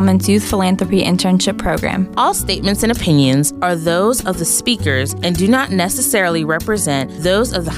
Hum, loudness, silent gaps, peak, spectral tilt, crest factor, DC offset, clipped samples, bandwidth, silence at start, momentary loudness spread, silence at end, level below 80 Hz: none; -15 LUFS; none; -2 dBFS; -4.5 dB/octave; 12 dB; under 0.1%; under 0.1%; 16 kHz; 0 s; 4 LU; 0 s; -34 dBFS